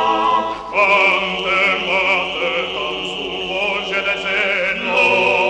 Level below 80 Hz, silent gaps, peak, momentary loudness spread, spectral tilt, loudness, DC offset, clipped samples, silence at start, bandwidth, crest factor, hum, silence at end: -50 dBFS; none; -2 dBFS; 9 LU; -3 dB/octave; -16 LUFS; under 0.1%; under 0.1%; 0 s; 10 kHz; 16 dB; none; 0 s